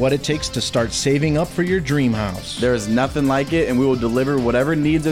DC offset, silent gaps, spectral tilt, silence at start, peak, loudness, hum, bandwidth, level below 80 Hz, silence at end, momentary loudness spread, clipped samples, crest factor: 0.4%; none; -5.5 dB/octave; 0 s; -6 dBFS; -19 LUFS; none; 16.5 kHz; -38 dBFS; 0 s; 3 LU; under 0.1%; 12 dB